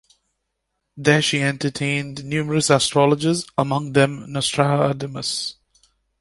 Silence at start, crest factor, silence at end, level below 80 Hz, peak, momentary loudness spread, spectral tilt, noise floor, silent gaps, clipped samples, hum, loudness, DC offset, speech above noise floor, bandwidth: 0.95 s; 20 dB; 0.7 s; -56 dBFS; -2 dBFS; 8 LU; -4.5 dB/octave; -76 dBFS; none; under 0.1%; none; -20 LUFS; under 0.1%; 56 dB; 11.5 kHz